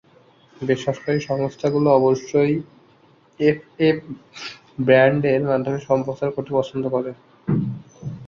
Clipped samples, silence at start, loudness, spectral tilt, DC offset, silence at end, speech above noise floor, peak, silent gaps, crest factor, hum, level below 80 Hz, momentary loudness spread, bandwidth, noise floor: under 0.1%; 0.6 s; -20 LUFS; -7 dB/octave; under 0.1%; 0 s; 35 dB; -2 dBFS; none; 18 dB; none; -58 dBFS; 16 LU; 7.4 kHz; -54 dBFS